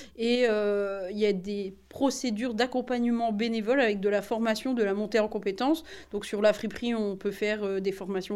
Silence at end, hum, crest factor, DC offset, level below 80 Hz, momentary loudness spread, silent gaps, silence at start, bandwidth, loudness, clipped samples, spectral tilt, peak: 0 s; none; 16 dB; under 0.1%; -60 dBFS; 7 LU; none; 0 s; 14 kHz; -28 LUFS; under 0.1%; -5 dB/octave; -12 dBFS